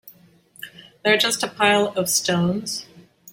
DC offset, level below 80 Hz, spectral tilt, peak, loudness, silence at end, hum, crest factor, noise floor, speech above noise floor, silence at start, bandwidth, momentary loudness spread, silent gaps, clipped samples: under 0.1%; -62 dBFS; -3 dB/octave; -2 dBFS; -20 LUFS; 0 s; none; 20 dB; -52 dBFS; 32 dB; 0.05 s; 16.5 kHz; 21 LU; none; under 0.1%